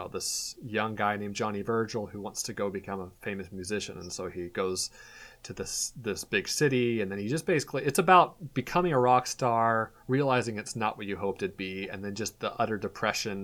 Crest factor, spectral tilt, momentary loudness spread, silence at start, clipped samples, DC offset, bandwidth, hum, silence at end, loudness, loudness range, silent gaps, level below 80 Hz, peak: 24 dB; -4 dB/octave; 12 LU; 0 s; under 0.1%; under 0.1%; 20 kHz; none; 0 s; -30 LUFS; 9 LU; none; -60 dBFS; -6 dBFS